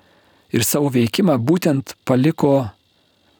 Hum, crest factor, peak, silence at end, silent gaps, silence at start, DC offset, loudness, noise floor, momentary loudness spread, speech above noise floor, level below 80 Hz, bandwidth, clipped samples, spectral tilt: none; 16 dB; -2 dBFS; 0.7 s; none; 0.55 s; under 0.1%; -18 LUFS; -60 dBFS; 6 LU; 43 dB; -58 dBFS; over 20 kHz; under 0.1%; -5.5 dB/octave